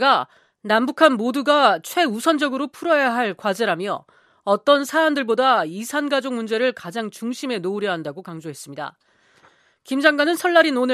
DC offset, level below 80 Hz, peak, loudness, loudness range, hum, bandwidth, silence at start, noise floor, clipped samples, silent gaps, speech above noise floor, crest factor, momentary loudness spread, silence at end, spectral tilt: under 0.1%; -78 dBFS; 0 dBFS; -20 LUFS; 7 LU; none; 14.5 kHz; 0 s; -56 dBFS; under 0.1%; none; 36 dB; 20 dB; 16 LU; 0 s; -4 dB/octave